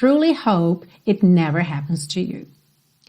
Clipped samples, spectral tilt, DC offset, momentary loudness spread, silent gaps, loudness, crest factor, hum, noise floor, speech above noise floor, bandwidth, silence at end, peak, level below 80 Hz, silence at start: under 0.1%; -7 dB/octave; under 0.1%; 9 LU; none; -19 LUFS; 14 dB; none; -60 dBFS; 42 dB; 10.5 kHz; 0.65 s; -6 dBFS; -60 dBFS; 0 s